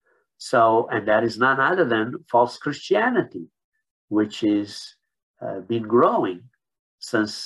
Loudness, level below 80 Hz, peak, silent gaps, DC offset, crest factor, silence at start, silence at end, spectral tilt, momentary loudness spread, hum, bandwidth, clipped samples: -21 LUFS; -68 dBFS; -4 dBFS; 3.64-3.72 s, 3.91-4.08 s, 5.23-5.34 s, 6.79-6.98 s; under 0.1%; 18 dB; 0.4 s; 0 s; -5.5 dB/octave; 18 LU; none; 12 kHz; under 0.1%